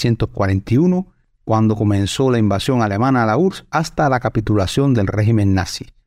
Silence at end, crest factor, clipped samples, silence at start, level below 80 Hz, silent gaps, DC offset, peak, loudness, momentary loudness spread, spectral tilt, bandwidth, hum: 0.25 s; 12 dB; under 0.1%; 0 s; -40 dBFS; none; under 0.1%; -4 dBFS; -17 LUFS; 5 LU; -6.5 dB/octave; 13.5 kHz; none